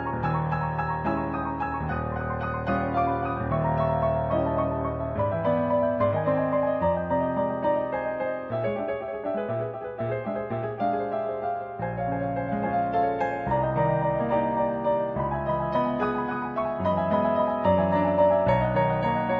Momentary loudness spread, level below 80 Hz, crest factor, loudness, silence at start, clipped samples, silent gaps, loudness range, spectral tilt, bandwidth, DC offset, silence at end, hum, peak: 7 LU; -46 dBFS; 16 dB; -26 LUFS; 0 s; under 0.1%; none; 5 LU; -10 dB/octave; 5.4 kHz; under 0.1%; 0 s; none; -10 dBFS